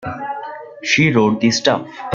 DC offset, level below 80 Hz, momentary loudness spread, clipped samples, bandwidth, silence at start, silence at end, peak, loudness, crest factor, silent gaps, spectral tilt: under 0.1%; -54 dBFS; 14 LU; under 0.1%; 7.6 kHz; 0 s; 0 s; -2 dBFS; -16 LUFS; 16 dB; none; -4.5 dB/octave